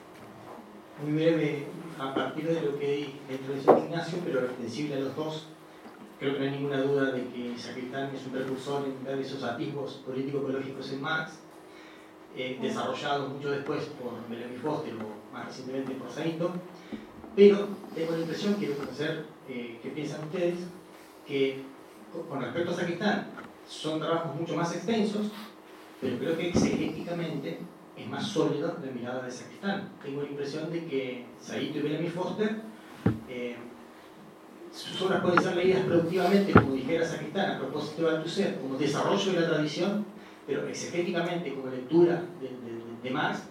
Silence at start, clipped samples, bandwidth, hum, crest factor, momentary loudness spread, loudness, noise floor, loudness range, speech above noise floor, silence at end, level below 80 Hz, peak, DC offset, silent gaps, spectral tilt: 0 s; under 0.1%; 16 kHz; none; 26 dB; 18 LU; -30 LUFS; -50 dBFS; 8 LU; 20 dB; 0 s; -66 dBFS; -4 dBFS; under 0.1%; none; -6 dB/octave